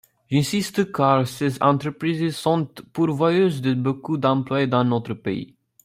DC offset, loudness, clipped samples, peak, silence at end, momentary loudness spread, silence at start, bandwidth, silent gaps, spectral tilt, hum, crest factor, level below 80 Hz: under 0.1%; -22 LUFS; under 0.1%; -4 dBFS; 0.4 s; 8 LU; 0.3 s; 16 kHz; none; -6.5 dB/octave; none; 18 dB; -60 dBFS